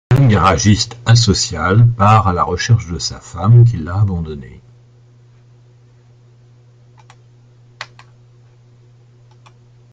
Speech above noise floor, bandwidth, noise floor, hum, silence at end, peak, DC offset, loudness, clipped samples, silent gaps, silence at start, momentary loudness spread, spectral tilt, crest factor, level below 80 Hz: 34 dB; 9.2 kHz; -46 dBFS; none; 2.1 s; 0 dBFS; under 0.1%; -13 LUFS; under 0.1%; none; 0.1 s; 19 LU; -5.5 dB/octave; 16 dB; -38 dBFS